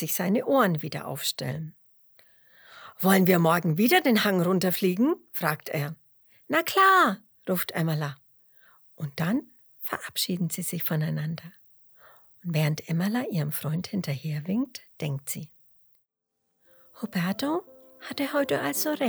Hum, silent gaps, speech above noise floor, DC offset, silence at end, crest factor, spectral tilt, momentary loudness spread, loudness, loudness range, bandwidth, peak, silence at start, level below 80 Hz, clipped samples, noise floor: none; none; 53 dB; under 0.1%; 0 s; 22 dB; -5 dB/octave; 15 LU; -26 LUFS; 10 LU; over 20 kHz; -6 dBFS; 0 s; -72 dBFS; under 0.1%; -79 dBFS